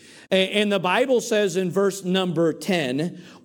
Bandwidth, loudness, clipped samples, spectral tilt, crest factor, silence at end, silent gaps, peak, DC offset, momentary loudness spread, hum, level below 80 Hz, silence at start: 18 kHz; -22 LUFS; under 0.1%; -4.5 dB/octave; 16 dB; 0.05 s; none; -6 dBFS; under 0.1%; 4 LU; none; -70 dBFS; 0.15 s